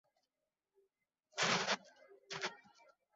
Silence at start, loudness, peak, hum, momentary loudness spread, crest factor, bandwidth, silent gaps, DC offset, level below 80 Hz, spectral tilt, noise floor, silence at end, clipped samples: 1.35 s; -39 LUFS; -22 dBFS; none; 14 LU; 22 dB; 7.6 kHz; none; under 0.1%; -86 dBFS; -0.5 dB/octave; under -90 dBFS; 0.6 s; under 0.1%